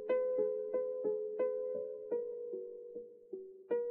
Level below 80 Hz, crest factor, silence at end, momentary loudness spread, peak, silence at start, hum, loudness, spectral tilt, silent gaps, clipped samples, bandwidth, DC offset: -88 dBFS; 14 dB; 0 s; 15 LU; -24 dBFS; 0 s; none; -38 LUFS; -5.5 dB/octave; none; under 0.1%; 3.2 kHz; under 0.1%